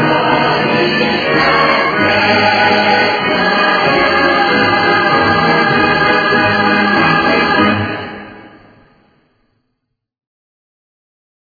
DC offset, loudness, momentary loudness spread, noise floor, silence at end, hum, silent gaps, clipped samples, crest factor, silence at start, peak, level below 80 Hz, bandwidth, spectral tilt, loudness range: under 0.1%; -11 LUFS; 2 LU; -71 dBFS; 2.95 s; none; none; under 0.1%; 14 dB; 0 s; 0 dBFS; -44 dBFS; 5 kHz; -6 dB/octave; 6 LU